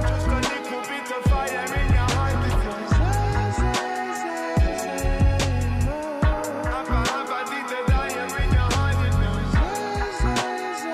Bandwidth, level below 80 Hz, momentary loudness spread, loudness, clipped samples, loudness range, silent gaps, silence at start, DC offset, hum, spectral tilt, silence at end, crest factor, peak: 14.5 kHz; -26 dBFS; 6 LU; -24 LUFS; under 0.1%; 1 LU; none; 0 s; under 0.1%; none; -5.5 dB/octave; 0 s; 12 dB; -10 dBFS